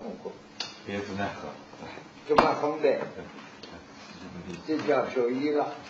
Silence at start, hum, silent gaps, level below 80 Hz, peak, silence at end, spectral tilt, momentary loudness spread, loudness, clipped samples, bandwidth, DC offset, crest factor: 0 s; none; none; -62 dBFS; -6 dBFS; 0 s; -5.5 dB/octave; 20 LU; -28 LUFS; under 0.1%; 8 kHz; under 0.1%; 24 dB